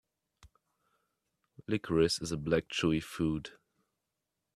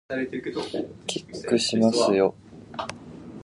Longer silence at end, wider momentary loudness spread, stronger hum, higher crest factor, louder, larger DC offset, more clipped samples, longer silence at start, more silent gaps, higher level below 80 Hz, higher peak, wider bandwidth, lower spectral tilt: first, 1.05 s vs 0 s; second, 10 LU vs 16 LU; neither; about the same, 22 dB vs 18 dB; second, -32 LUFS vs -25 LUFS; neither; neither; first, 1.6 s vs 0.1 s; neither; about the same, -58 dBFS vs -60 dBFS; second, -14 dBFS vs -8 dBFS; first, 13.5 kHz vs 11.5 kHz; about the same, -5 dB/octave vs -4.5 dB/octave